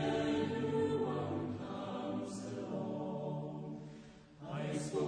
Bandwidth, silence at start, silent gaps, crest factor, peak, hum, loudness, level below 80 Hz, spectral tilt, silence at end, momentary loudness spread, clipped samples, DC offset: 10 kHz; 0 s; none; 14 dB; -24 dBFS; none; -39 LUFS; -68 dBFS; -6.5 dB/octave; 0 s; 13 LU; under 0.1%; under 0.1%